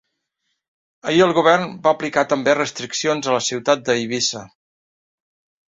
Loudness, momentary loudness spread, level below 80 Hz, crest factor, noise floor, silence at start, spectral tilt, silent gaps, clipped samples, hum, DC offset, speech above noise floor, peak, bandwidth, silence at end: -18 LUFS; 7 LU; -62 dBFS; 18 dB; -75 dBFS; 1.05 s; -3.5 dB/octave; none; under 0.1%; none; under 0.1%; 56 dB; -2 dBFS; 7.8 kHz; 1.2 s